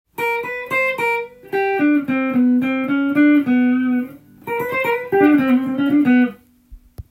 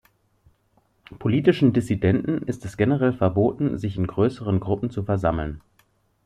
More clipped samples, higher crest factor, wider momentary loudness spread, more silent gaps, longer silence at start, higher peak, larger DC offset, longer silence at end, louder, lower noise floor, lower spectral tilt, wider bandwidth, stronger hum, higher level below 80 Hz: neither; about the same, 16 dB vs 18 dB; about the same, 9 LU vs 8 LU; neither; second, 0.2 s vs 1.1 s; about the same, -2 dBFS vs -4 dBFS; neither; second, 0.1 s vs 0.65 s; first, -17 LUFS vs -23 LUFS; second, -44 dBFS vs -65 dBFS; second, -6.5 dB/octave vs -8.5 dB/octave; first, 16 kHz vs 11.5 kHz; neither; second, -52 dBFS vs -46 dBFS